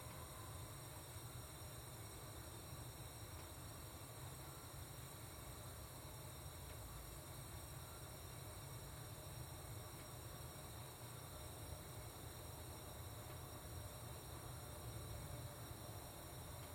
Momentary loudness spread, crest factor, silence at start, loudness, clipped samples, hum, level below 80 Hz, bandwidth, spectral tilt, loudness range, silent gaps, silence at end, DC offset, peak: 1 LU; 14 dB; 0 s; -53 LUFS; under 0.1%; none; -64 dBFS; 16.5 kHz; -4 dB/octave; 1 LU; none; 0 s; under 0.1%; -38 dBFS